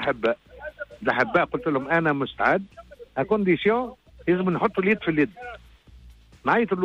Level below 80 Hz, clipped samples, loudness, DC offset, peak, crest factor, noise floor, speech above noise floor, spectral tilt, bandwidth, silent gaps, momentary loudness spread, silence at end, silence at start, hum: -54 dBFS; under 0.1%; -24 LUFS; under 0.1%; -8 dBFS; 16 dB; -49 dBFS; 26 dB; -8 dB/octave; 7.8 kHz; none; 15 LU; 0 s; 0 s; none